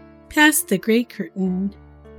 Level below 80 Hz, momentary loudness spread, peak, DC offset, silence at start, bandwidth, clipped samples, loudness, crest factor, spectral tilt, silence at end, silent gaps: -50 dBFS; 13 LU; -2 dBFS; under 0.1%; 0.3 s; 19 kHz; under 0.1%; -19 LUFS; 20 dB; -3.5 dB/octave; 0 s; none